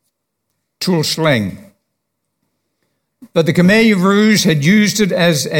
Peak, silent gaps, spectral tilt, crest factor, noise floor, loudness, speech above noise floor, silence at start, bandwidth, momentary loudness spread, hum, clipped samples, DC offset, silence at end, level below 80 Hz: 0 dBFS; none; -5 dB/octave; 14 dB; -73 dBFS; -13 LUFS; 61 dB; 0.8 s; 17.5 kHz; 8 LU; none; under 0.1%; under 0.1%; 0 s; -54 dBFS